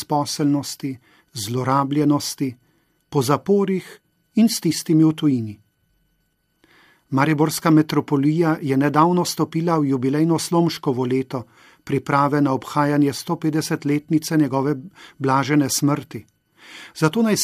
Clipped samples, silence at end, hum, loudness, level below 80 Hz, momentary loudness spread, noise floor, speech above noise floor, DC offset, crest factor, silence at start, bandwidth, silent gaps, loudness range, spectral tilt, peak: under 0.1%; 0 s; none; -20 LUFS; -64 dBFS; 11 LU; -68 dBFS; 48 dB; under 0.1%; 20 dB; 0 s; 15.5 kHz; none; 3 LU; -5.5 dB/octave; 0 dBFS